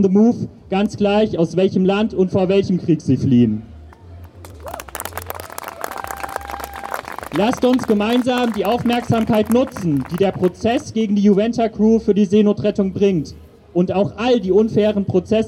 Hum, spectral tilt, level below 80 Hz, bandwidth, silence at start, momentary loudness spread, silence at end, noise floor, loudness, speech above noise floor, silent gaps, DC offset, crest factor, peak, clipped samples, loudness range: none; -7 dB/octave; -46 dBFS; 17.5 kHz; 0 s; 14 LU; 0 s; -39 dBFS; -18 LUFS; 22 dB; none; under 0.1%; 14 dB; -4 dBFS; under 0.1%; 8 LU